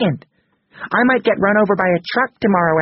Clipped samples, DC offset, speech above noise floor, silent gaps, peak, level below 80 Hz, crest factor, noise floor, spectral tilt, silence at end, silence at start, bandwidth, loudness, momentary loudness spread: under 0.1%; under 0.1%; 34 dB; none; -2 dBFS; -54 dBFS; 16 dB; -50 dBFS; -4.5 dB/octave; 0 s; 0 s; 5.8 kHz; -16 LUFS; 6 LU